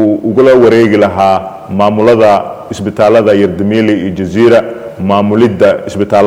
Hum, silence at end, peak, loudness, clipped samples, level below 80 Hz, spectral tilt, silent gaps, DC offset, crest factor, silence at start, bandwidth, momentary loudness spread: none; 0 s; 0 dBFS; -9 LUFS; 1%; -44 dBFS; -7 dB/octave; none; under 0.1%; 8 dB; 0 s; 12.5 kHz; 9 LU